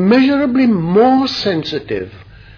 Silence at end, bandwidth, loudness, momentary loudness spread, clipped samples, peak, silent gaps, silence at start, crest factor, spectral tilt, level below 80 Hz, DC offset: 0.35 s; 5.4 kHz; -14 LUFS; 13 LU; under 0.1%; 0 dBFS; none; 0 s; 12 dB; -7 dB/octave; -46 dBFS; under 0.1%